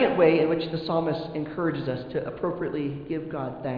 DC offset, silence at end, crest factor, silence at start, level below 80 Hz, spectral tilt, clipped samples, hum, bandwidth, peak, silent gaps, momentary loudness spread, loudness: under 0.1%; 0 s; 18 dB; 0 s; -56 dBFS; -9.5 dB/octave; under 0.1%; none; 5.2 kHz; -8 dBFS; none; 12 LU; -27 LUFS